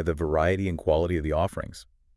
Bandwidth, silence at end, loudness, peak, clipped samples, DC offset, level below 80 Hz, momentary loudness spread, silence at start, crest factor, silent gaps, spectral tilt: 12 kHz; 0.35 s; -26 LUFS; -10 dBFS; under 0.1%; under 0.1%; -40 dBFS; 9 LU; 0 s; 16 dB; none; -7 dB/octave